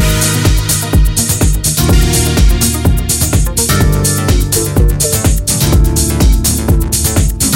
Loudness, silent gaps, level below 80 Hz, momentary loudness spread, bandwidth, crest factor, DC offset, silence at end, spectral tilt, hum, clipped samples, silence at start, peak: -11 LUFS; none; -14 dBFS; 2 LU; 17 kHz; 10 dB; under 0.1%; 0 s; -4 dB/octave; none; under 0.1%; 0 s; 0 dBFS